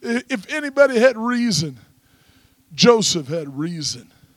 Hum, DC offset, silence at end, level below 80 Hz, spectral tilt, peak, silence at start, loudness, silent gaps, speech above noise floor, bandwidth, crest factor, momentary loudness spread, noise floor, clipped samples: none; under 0.1%; 0.35 s; -62 dBFS; -4 dB/octave; -2 dBFS; 0 s; -18 LUFS; none; 36 dB; 14.5 kHz; 18 dB; 13 LU; -56 dBFS; under 0.1%